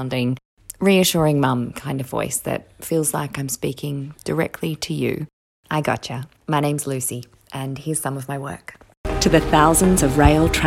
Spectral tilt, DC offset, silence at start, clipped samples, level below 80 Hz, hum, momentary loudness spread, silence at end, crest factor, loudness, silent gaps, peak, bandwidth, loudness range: -5 dB/octave; under 0.1%; 0 s; under 0.1%; -34 dBFS; none; 16 LU; 0 s; 20 dB; -20 LUFS; 0.45-0.57 s, 5.33-5.63 s, 8.97-9.04 s; 0 dBFS; 17 kHz; 6 LU